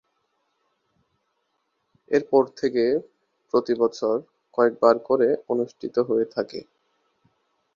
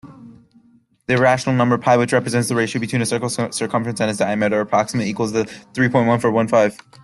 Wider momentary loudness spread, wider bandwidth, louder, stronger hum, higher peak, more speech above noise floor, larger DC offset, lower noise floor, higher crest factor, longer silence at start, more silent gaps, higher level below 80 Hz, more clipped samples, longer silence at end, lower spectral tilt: first, 9 LU vs 6 LU; second, 7.2 kHz vs 12.5 kHz; second, -23 LUFS vs -18 LUFS; neither; about the same, -2 dBFS vs -2 dBFS; first, 52 dB vs 37 dB; neither; first, -74 dBFS vs -55 dBFS; first, 22 dB vs 16 dB; first, 2.1 s vs 0.05 s; neither; second, -70 dBFS vs -58 dBFS; neither; first, 1.15 s vs 0.3 s; about the same, -6 dB/octave vs -5.5 dB/octave